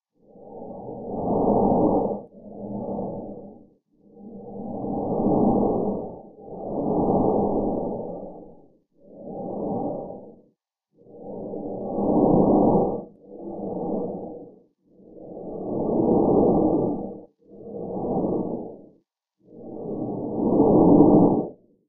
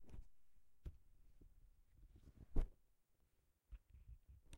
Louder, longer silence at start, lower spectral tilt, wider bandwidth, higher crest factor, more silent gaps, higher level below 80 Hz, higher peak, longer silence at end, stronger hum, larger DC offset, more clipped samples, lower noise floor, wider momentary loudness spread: first, -23 LUFS vs -56 LUFS; first, 0.35 s vs 0 s; first, -17 dB/octave vs -7.5 dB/octave; second, 1.3 kHz vs 3.3 kHz; about the same, 22 dB vs 26 dB; neither; first, -46 dBFS vs -52 dBFS; first, -2 dBFS vs -24 dBFS; first, 0.35 s vs 0 s; neither; neither; neither; second, -69 dBFS vs -80 dBFS; first, 22 LU vs 17 LU